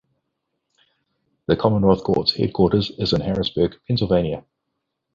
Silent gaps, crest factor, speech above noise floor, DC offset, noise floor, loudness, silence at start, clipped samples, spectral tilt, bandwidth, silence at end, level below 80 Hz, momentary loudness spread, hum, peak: none; 20 dB; 58 dB; under 0.1%; -78 dBFS; -20 LUFS; 1.5 s; under 0.1%; -8 dB/octave; 7.4 kHz; 0.75 s; -44 dBFS; 6 LU; none; -2 dBFS